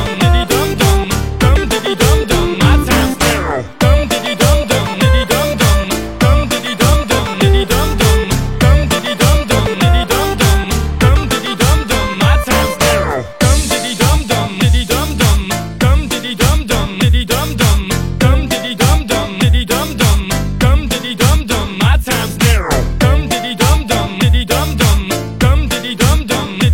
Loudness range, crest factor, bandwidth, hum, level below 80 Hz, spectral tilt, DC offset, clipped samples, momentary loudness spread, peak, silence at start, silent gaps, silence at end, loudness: 1 LU; 12 dB; 17 kHz; none; -16 dBFS; -4.5 dB/octave; 1%; under 0.1%; 5 LU; 0 dBFS; 0 s; none; 0 s; -13 LUFS